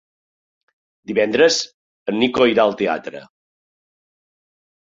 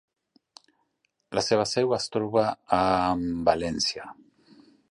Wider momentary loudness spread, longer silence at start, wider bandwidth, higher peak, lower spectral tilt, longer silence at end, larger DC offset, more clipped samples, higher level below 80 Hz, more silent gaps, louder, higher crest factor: first, 17 LU vs 6 LU; second, 1.1 s vs 1.3 s; second, 7.8 kHz vs 11.5 kHz; first, -2 dBFS vs -6 dBFS; about the same, -3.5 dB/octave vs -4.5 dB/octave; first, 1.7 s vs 0.8 s; neither; neither; second, -60 dBFS vs -54 dBFS; first, 1.74-2.06 s vs none; first, -18 LUFS vs -25 LUFS; about the same, 20 dB vs 22 dB